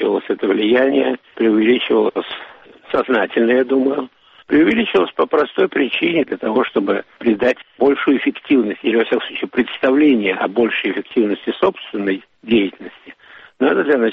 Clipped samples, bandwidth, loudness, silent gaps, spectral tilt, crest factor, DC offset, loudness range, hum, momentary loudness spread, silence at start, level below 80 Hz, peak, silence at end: under 0.1%; 5.6 kHz; -17 LUFS; none; -3 dB/octave; 14 dB; under 0.1%; 1 LU; none; 7 LU; 0 s; -56 dBFS; -2 dBFS; 0 s